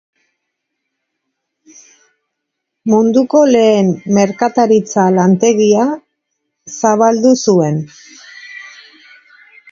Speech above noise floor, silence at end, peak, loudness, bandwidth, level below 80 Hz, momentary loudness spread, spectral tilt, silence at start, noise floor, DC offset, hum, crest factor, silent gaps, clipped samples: 64 dB; 1.05 s; 0 dBFS; -12 LUFS; 7.6 kHz; -60 dBFS; 20 LU; -6 dB/octave; 2.85 s; -75 dBFS; under 0.1%; none; 14 dB; none; under 0.1%